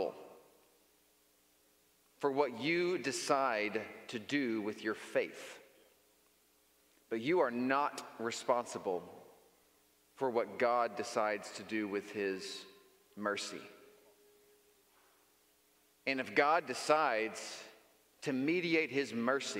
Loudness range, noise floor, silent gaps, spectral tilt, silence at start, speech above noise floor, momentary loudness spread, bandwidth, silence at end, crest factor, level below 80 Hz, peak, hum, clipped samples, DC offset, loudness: 7 LU; -71 dBFS; none; -4 dB/octave; 0 s; 36 dB; 14 LU; 16 kHz; 0 s; 24 dB; -86 dBFS; -14 dBFS; none; under 0.1%; under 0.1%; -36 LUFS